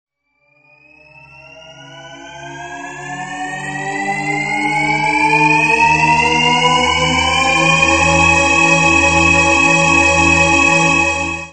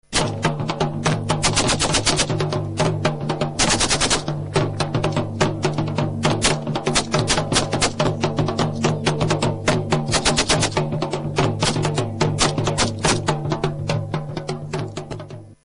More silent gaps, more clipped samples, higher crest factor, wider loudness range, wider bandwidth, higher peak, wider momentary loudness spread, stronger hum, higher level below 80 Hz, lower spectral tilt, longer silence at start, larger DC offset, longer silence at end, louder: neither; neither; about the same, 14 dB vs 18 dB; first, 16 LU vs 2 LU; second, 8.8 kHz vs 11 kHz; first, 0 dBFS vs -4 dBFS; first, 16 LU vs 7 LU; neither; about the same, -36 dBFS vs -38 dBFS; about the same, -3 dB/octave vs -4 dB/octave; first, 1.4 s vs 0.1 s; first, 0.4% vs under 0.1%; second, 0 s vs 0.15 s; first, -11 LUFS vs -20 LUFS